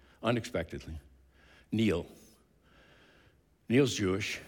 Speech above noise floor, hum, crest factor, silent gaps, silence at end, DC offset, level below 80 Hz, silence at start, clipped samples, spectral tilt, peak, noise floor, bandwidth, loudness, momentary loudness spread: 34 dB; none; 20 dB; none; 0 s; under 0.1%; -56 dBFS; 0.2 s; under 0.1%; -5.5 dB/octave; -14 dBFS; -65 dBFS; 18 kHz; -32 LUFS; 19 LU